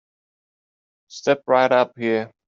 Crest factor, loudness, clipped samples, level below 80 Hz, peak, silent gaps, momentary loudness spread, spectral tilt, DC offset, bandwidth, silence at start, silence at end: 20 dB; -20 LUFS; under 0.1%; -72 dBFS; -4 dBFS; none; 7 LU; -3 dB/octave; under 0.1%; 7.6 kHz; 1.15 s; 0.2 s